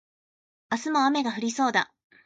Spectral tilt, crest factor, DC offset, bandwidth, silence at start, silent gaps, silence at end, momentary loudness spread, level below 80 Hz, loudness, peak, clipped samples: -3 dB/octave; 18 dB; under 0.1%; 9.2 kHz; 0.7 s; none; 0.4 s; 9 LU; -76 dBFS; -26 LUFS; -10 dBFS; under 0.1%